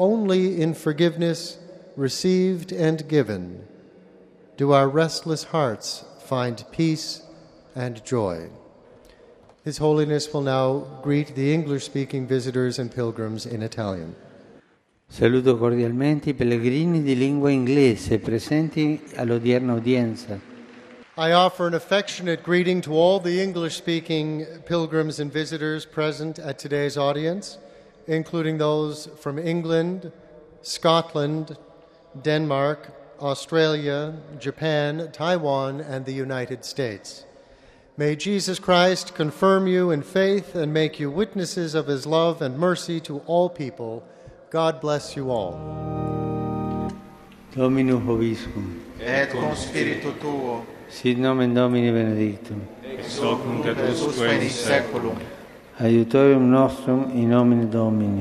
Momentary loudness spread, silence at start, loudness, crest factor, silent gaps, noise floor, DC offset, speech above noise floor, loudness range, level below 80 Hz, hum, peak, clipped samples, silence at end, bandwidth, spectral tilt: 14 LU; 0 s; -23 LUFS; 20 dB; none; -61 dBFS; under 0.1%; 39 dB; 6 LU; -54 dBFS; none; -2 dBFS; under 0.1%; 0 s; 14 kHz; -6 dB/octave